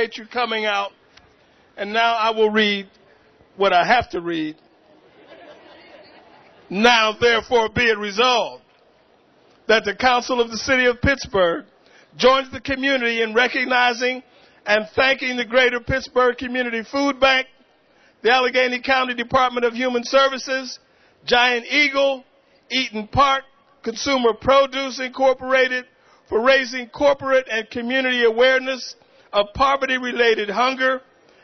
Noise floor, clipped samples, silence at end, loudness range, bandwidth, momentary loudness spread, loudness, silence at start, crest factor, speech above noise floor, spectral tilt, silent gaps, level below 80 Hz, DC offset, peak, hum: -56 dBFS; under 0.1%; 0.45 s; 2 LU; 6.4 kHz; 10 LU; -19 LUFS; 0 s; 20 dB; 37 dB; -3.5 dB/octave; none; -48 dBFS; under 0.1%; 0 dBFS; none